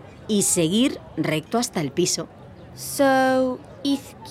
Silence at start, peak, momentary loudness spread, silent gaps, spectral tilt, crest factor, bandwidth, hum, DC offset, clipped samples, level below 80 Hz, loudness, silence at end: 0 s; -6 dBFS; 10 LU; none; -3.5 dB/octave; 16 dB; 16.5 kHz; none; under 0.1%; under 0.1%; -56 dBFS; -22 LUFS; 0 s